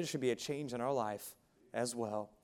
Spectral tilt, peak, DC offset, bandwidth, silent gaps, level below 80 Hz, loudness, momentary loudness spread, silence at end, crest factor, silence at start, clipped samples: -4.5 dB/octave; -22 dBFS; under 0.1%; 17 kHz; none; -76 dBFS; -39 LUFS; 9 LU; 0.15 s; 16 dB; 0 s; under 0.1%